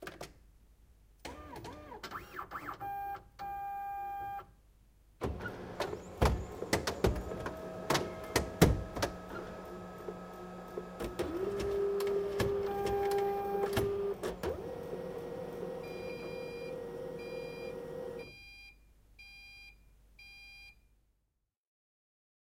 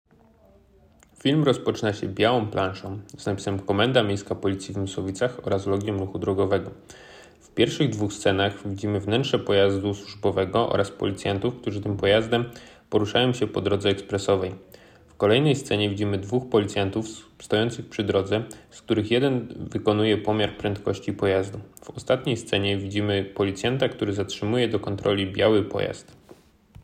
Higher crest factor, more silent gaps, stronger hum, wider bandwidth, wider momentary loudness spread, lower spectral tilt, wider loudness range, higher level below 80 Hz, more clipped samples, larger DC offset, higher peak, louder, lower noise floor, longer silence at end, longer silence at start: first, 30 dB vs 18 dB; neither; neither; about the same, 16 kHz vs 15 kHz; first, 18 LU vs 9 LU; about the same, -5 dB/octave vs -6 dB/octave; first, 14 LU vs 2 LU; first, -48 dBFS vs -56 dBFS; neither; neither; about the same, -8 dBFS vs -6 dBFS; second, -37 LUFS vs -25 LUFS; first, -82 dBFS vs -56 dBFS; first, 1.75 s vs 0.8 s; second, 0 s vs 1.25 s